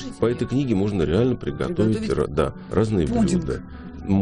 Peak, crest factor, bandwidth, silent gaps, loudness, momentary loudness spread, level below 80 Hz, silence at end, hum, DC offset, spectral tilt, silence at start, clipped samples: -6 dBFS; 16 dB; 10.5 kHz; none; -23 LUFS; 6 LU; -38 dBFS; 0 s; none; under 0.1%; -7.5 dB/octave; 0 s; under 0.1%